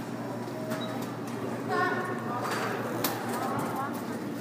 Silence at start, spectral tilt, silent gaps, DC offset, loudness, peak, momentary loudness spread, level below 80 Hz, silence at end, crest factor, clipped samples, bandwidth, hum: 0 s; -5 dB/octave; none; under 0.1%; -32 LUFS; -12 dBFS; 7 LU; -70 dBFS; 0 s; 20 dB; under 0.1%; 15.5 kHz; none